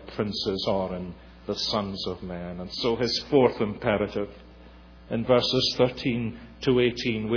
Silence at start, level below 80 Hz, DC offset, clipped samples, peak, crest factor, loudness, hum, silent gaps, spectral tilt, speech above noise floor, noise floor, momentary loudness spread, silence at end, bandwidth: 0 s; -50 dBFS; under 0.1%; under 0.1%; -8 dBFS; 18 dB; -26 LUFS; none; none; -5.5 dB/octave; 23 dB; -48 dBFS; 13 LU; 0 s; 5.4 kHz